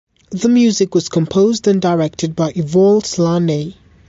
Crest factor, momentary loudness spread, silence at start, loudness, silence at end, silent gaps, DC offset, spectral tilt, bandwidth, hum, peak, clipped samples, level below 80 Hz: 12 dB; 7 LU; 0.3 s; -15 LUFS; 0.35 s; none; under 0.1%; -6 dB/octave; 8 kHz; none; -2 dBFS; under 0.1%; -50 dBFS